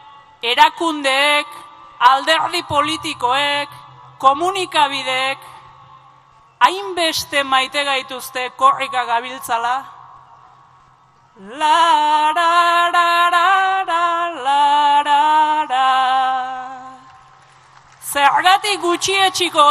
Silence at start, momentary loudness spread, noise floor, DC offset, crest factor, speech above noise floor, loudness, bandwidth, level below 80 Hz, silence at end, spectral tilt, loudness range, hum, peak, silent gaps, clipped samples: 0.05 s; 9 LU; -51 dBFS; under 0.1%; 18 dB; 35 dB; -16 LUFS; 14.5 kHz; -62 dBFS; 0 s; -1.5 dB/octave; 5 LU; none; 0 dBFS; none; under 0.1%